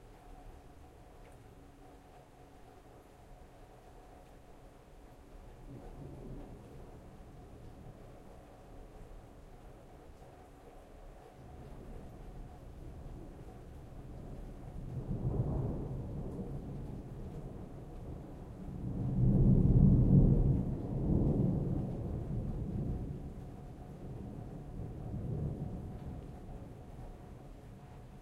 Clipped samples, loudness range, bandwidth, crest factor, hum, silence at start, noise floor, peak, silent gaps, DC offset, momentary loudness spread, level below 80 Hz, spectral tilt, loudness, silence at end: under 0.1%; 27 LU; 7.4 kHz; 24 dB; none; 0 s; -57 dBFS; -12 dBFS; none; under 0.1%; 26 LU; -44 dBFS; -10.5 dB/octave; -35 LUFS; 0 s